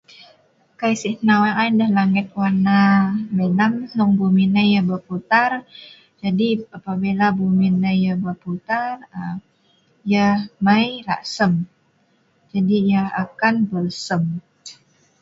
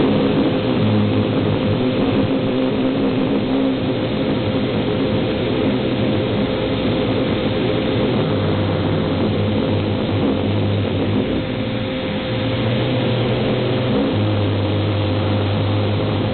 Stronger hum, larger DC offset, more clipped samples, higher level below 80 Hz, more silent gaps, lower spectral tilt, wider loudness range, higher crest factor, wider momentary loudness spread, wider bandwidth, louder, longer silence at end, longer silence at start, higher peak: neither; neither; neither; second, -58 dBFS vs -38 dBFS; neither; second, -6.5 dB/octave vs -10.5 dB/octave; about the same, 4 LU vs 2 LU; first, 18 dB vs 12 dB; first, 12 LU vs 2 LU; first, 7.8 kHz vs 4.5 kHz; about the same, -19 LUFS vs -19 LUFS; first, 0.5 s vs 0 s; first, 0.8 s vs 0 s; first, -2 dBFS vs -6 dBFS